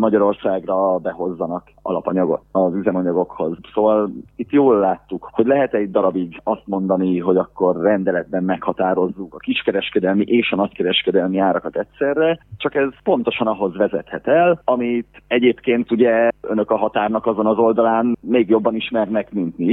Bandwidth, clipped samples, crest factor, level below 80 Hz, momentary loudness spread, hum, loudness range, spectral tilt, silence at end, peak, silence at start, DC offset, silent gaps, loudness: 4.1 kHz; under 0.1%; 16 dB; -54 dBFS; 8 LU; none; 2 LU; -9.5 dB/octave; 0 s; -2 dBFS; 0 s; under 0.1%; none; -19 LUFS